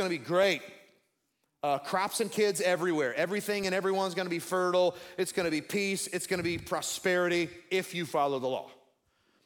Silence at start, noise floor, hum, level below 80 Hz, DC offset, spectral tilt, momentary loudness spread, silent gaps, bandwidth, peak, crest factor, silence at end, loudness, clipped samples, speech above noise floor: 0 s; -79 dBFS; none; -68 dBFS; under 0.1%; -4 dB/octave; 6 LU; none; 18 kHz; -14 dBFS; 18 dB; 0.7 s; -30 LUFS; under 0.1%; 48 dB